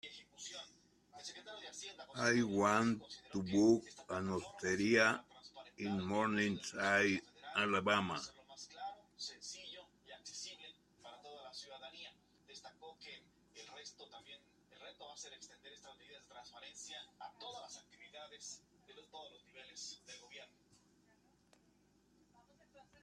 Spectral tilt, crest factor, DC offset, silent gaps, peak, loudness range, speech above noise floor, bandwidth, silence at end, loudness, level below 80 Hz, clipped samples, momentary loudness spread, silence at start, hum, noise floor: -4 dB/octave; 24 dB; under 0.1%; none; -16 dBFS; 20 LU; 35 dB; 12.5 kHz; 0.2 s; -38 LUFS; -76 dBFS; under 0.1%; 24 LU; 0.05 s; none; -73 dBFS